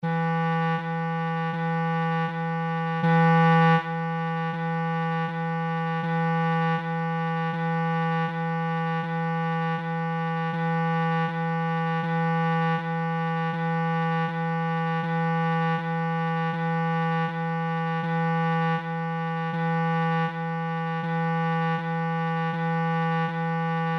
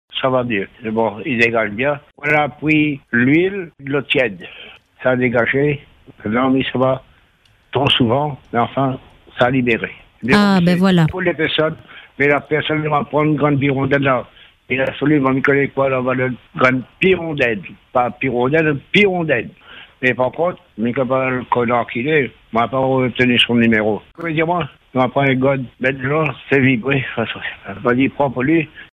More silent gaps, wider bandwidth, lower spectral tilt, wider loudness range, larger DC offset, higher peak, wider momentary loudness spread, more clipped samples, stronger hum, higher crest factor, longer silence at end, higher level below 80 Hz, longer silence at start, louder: neither; second, 5.8 kHz vs 12 kHz; first, -8.5 dB/octave vs -7 dB/octave; about the same, 3 LU vs 2 LU; neither; second, -12 dBFS vs 0 dBFS; second, 4 LU vs 8 LU; neither; neither; about the same, 14 dB vs 16 dB; about the same, 0 s vs 0.1 s; second, -76 dBFS vs -50 dBFS; about the same, 0 s vs 0.1 s; second, -26 LUFS vs -17 LUFS